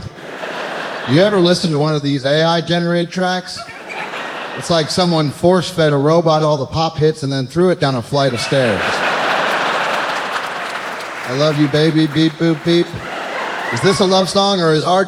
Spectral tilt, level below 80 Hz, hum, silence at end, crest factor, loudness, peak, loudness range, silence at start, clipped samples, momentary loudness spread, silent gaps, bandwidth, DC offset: -5.5 dB/octave; -50 dBFS; none; 0 s; 16 dB; -16 LUFS; 0 dBFS; 2 LU; 0 s; under 0.1%; 11 LU; none; 15 kHz; under 0.1%